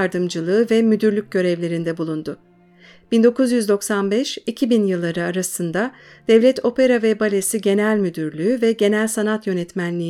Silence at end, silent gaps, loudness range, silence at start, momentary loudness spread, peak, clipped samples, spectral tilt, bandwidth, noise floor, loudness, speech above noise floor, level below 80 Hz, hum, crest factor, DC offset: 0 s; none; 3 LU; 0 s; 8 LU; -2 dBFS; under 0.1%; -5 dB/octave; 16 kHz; -49 dBFS; -19 LUFS; 30 dB; -64 dBFS; none; 16 dB; under 0.1%